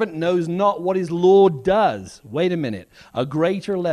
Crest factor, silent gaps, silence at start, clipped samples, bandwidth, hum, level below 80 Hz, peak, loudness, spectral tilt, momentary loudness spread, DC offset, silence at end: 14 dB; none; 0 s; under 0.1%; 10.5 kHz; none; -54 dBFS; -4 dBFS; -19 LUFS; -7 dB/octave; 14 LU; under 0.1%; 0 s